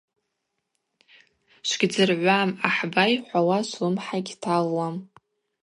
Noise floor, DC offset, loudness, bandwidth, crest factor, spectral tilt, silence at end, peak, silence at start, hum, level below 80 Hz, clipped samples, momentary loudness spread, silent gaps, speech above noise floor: -79 dBFS; under 0.1%; -23 LUFS; 11 kHz; 22 dB; -4.5 dB/octave; 0.6 s; -4 dBFS; 1.65 s; none; -74 dBFS; under 0.1%; 9 LU; none; 56 dB